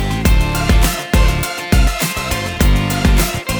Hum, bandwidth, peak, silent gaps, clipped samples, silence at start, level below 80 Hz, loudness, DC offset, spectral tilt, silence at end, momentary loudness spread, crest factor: none; over 20 kHz; 0 dBFS; none; under 0.1%; 0 s; -16 dBFS; -15 LUFS; under 0.1%; -4.5 dB/octave; 0 s; 4 LU; 14 dB